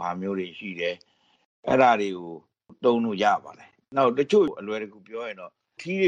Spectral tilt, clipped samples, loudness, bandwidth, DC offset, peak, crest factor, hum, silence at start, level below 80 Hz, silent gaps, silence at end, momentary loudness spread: -6 dB/octave; under 0.1%; -25 LUFS; 9.2 kHz; under 0.1%; -6 dBFS; 20 dB; none; 0 s; -66 dBFS; 1.45-1.63 s; 0 s; 19 LU